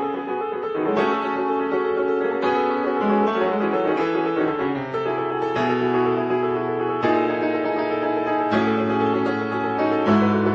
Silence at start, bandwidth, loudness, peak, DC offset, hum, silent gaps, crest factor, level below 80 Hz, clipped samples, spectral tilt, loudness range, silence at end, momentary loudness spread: 0 s; 7.4 kHz; -22 LUFS; -8 dBFS; under 0.1%; none; none; 14 dB; -60 dBFS; under 0.1%; -7.5 dB/octave; 1 LU; 0 s; 4 LU